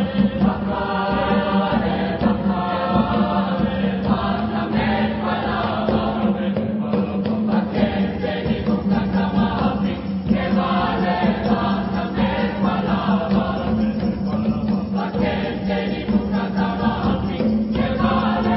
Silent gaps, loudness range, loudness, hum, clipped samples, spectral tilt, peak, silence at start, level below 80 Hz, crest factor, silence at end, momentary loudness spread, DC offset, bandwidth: none; 1 LU; -21 LUFS; none; under 0.1%; -12 dB/octave; -4 dBFS; 0 s; -36 dBFS; 16 dB; 0 s; 3 LU; under 0.1%; 5.8 kHz